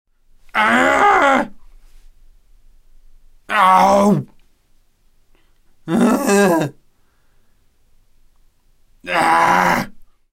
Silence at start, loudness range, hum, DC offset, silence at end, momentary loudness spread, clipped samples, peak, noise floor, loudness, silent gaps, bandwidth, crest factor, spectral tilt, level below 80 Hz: 0.55 s; 3 LU; none; under 0.1%; 0.35 s; 15 LU; under 0.1%; -2 dBFS; -55 dBFS; -15 LUFS; none; 16 kHz; 16 dB; -5 dB/octave; -48 dBFS